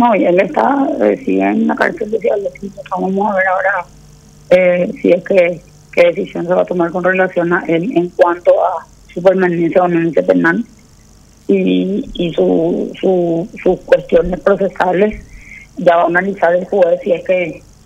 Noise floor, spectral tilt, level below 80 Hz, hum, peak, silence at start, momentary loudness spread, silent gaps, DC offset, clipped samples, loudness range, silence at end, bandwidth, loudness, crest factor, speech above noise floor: -44 dBFS; -7.5 dB/octave; -42 dBFS; none; 0 dBFS; 0 s; 8 LU; none; under 0.1%; under 0.1%; 2 LU; 0.25 s; 8.6 kHz; -14 LUFS; 14 dB; 31 dB